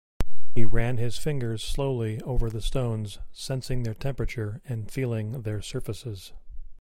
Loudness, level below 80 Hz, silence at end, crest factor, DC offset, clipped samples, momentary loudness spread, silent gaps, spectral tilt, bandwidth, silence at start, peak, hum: -31 LUFS; -34 dBFS; 0 s; 16 dB; under 0.1%; under 0.1%; 10 LU; none; -6 dB/octave; 15 kHz; 0.2 s; -4 dBFS; none